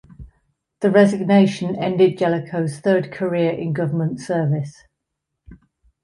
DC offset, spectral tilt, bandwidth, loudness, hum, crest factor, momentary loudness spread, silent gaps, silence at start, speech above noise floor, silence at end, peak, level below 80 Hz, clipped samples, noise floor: under 0.1%; -7.5 dB/octave; 11 kHz; -19 LUFS; none; 18 dB; 9 LU; none; 0.2 s; 61 dB; 0.5 s; -2 dBFS; -54 dBFS; under 0.1%; -79 dBFS